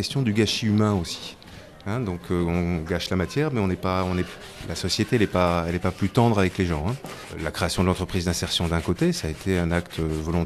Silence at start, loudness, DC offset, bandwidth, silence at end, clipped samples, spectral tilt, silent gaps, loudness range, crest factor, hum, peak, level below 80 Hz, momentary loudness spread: 0 s; -24 LUFS; under 0.1%; 14 kHz; 0 s; under 0.1%; -5.5 dB/octave; none; 3 LU; 16 dB; none; -8 dBFS; -42 dBFS; 11 LU